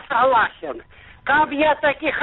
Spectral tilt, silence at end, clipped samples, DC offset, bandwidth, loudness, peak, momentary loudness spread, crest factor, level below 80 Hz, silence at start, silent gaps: -1 dB/octave; 0 s; under 0.1%; under 0.1%; 4.1 kHz; -18 LUFS; -8 dBFS; 16 LU; 12 dB; -50 dBFS; 0.1 s; none